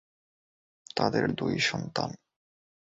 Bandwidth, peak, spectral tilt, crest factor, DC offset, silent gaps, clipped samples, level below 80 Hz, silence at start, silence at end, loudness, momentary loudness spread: 8 kHz; -10 dBFS; -4.5 dB/octave; 22 dB; under 0.1%; none; under 0.1%; -62 dBFS; 0.95 s; 0.75 s; -29 LUFS; 9 LU